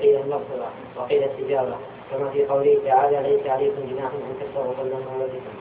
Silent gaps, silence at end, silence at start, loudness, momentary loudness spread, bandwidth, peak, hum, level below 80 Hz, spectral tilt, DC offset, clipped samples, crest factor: none; 0 s; 0 s; -23 LUFS; 12 LU; 3.9 kHz; -6 dBFS; none; -62 dBFS; -10.5 dB/octave; under 0.1%; under 0.1%; 16 dB